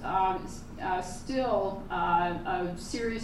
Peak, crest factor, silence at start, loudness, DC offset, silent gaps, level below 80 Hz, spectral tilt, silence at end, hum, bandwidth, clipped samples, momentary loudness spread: -14 dBFS; 16 dB; 0 s; -31 LUFS; under 0.1%; none; -46 dBFS; -5 dB/octave; 0 s; none; 14 kHz; under 0.1%; 8 LU